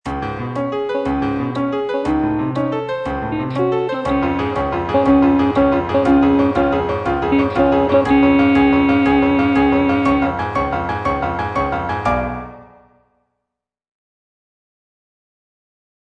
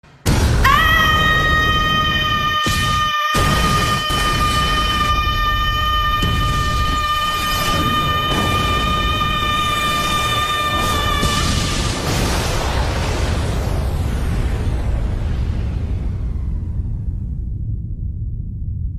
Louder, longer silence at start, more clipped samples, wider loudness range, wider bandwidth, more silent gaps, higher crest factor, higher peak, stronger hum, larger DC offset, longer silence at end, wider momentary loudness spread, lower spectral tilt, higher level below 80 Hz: about the same, -17 LUFS vs -17 LUFS; second, 0.05 s vs 0.25 s; neither; about the same, 9 LU vs 8 LU; second, 6.8 kHz vs 15.5 kHz; neither; about the same, 16 dB vs 16 dB; about the same, -2 dBFS vs 0 dBFS; neither; neither; first, 3.4 s vs 0 s; about the same, 9 LU vs 11 LU; first, -8 dB/octave vs -4 dB/octave; second, -36 dBFS vs -24 dBFS